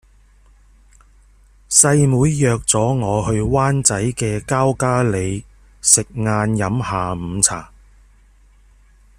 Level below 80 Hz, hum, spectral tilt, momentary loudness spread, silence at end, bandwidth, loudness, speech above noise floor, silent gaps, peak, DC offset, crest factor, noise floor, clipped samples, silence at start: -40 dBFS; none; -4.5 dB/octave; 10 LU; 1.55 s; 15.5 kHz; -16 LUFS; 33 dB; none; 0 dBFS; under 0.1%; 18 dB; -50 dBFS; under 0.1%; 1.7 s